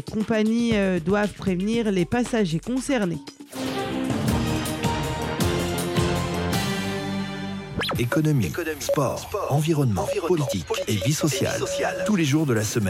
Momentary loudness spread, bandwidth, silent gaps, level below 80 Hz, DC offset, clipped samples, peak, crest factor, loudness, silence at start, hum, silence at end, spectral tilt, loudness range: 6 LU; 16 kHz; none; -44 dBFS; under 0.1%; under 0.1%; -10 dBFS; 14 dB; -24 LUFS; 0.05 s; none; 0 s; -5.5 dB/octave; 2 LU